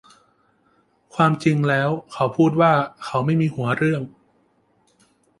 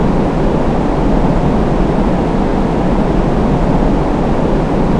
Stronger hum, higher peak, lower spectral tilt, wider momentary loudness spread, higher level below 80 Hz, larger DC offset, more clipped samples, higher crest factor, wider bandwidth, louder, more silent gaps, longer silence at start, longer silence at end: neither; second, -4 dBFS vs 0 dBFS; about the same, -7.5 dB/octave vs -8.5 dB/octave; first, 8 LU vs 1 LU; second, -60 dBFS vs -18 dBFS; neither; neither; first, 18 dB vs 12 dB; first, 11.5 kHz vs 10 kHz; second, -20 LUFS vs -14 LUFS; neither; first, 1.15 s vs 0 s; first, 1.3 s vs 0 s